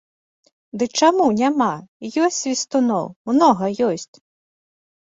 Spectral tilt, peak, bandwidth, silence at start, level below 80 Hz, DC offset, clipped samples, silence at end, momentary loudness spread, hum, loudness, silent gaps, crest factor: -4 dB/octave; -2 dBFS; 8 kHz; 0.75 s; -64 dBFS; under 0.1%; under 0.1%; 1.1 s; 12 LU; none; -19 LUFS; 1.88-2.00 s, 3.16-3.25 s; 18 dB